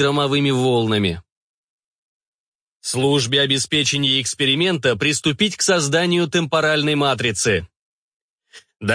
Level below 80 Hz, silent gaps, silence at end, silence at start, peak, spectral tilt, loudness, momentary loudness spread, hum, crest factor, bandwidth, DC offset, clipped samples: -54 dBFS; 1.32-2.20 s, 2.27-2.80 s, 7.79-8.36 s, 8.76-8.80 s; 0 s; 0 s; -4 dBFS; -3.5 dB/octave; -18 LUFS; 4 LU; none; 16 dB; 10.5 kHz; under 0.1%; under 0.1%